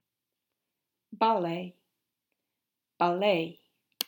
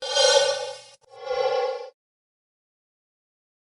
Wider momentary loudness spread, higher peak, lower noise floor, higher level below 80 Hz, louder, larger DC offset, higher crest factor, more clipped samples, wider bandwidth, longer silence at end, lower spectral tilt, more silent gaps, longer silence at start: second, 12 LU vs 23 LU; about the same, -8 dBFS vs -6 dBFS; first, -87 dBFS vs -46 dBFS; second, -90 dBFS vs -74 dBFS; second, -29 LUFS vs -22 LUFS; neither; about the same, 24 dB vs 22 dB; neither; first, 18 kHz vs 11.5 kHz; second, 0.05 s vs 1.85 s; first, -5 dB/octave vs 1.5 dB/octave; neither; first, 1.1 s vs 0 s